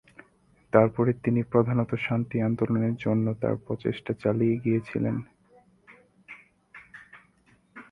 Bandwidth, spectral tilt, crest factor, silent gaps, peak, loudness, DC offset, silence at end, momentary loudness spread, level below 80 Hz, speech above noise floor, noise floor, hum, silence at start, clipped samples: 4.9 kHz; -10 dB/octave; 24 dB; none; -4 dBFS; -26 LUFS; under 0.1%; 0.1 s; 23 LU; -60 dBFS; 38 dB; -63 dBFS; none; 0.75 s; under 0.1%